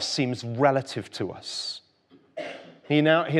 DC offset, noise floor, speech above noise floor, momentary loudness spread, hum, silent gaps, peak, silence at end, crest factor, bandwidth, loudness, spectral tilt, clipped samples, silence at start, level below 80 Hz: under 0.1%; -59 dBFS; 34 dB; 17 LU; none; none; -6 dBFS; 0 s; 20 dB; 11.5 kHz; -26 LUFS; -5 dB/octave; under 0.1%; 0 s; -74 dBFS